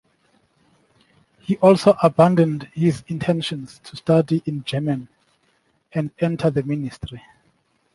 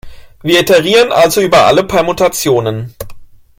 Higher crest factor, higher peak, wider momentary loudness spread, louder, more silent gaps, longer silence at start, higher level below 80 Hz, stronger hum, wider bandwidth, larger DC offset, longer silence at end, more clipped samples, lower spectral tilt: first, 20 dB vs 12 dB; about the same, -2 dBFS vs 0 dBFS; about the same, 16 LU vs 15 LU; second, -20 LUFS vs -10 LUFS; neither; first, 1.5 s vs 0.05 s; second, -54 dBFS vs -38 dBFS; neither; second, 11.5 kHz vs 17.5 kHz; neither; first, 0.75 s vs 0.35 s; neither; first, -7.5 dB/octave vs -4 dB/octave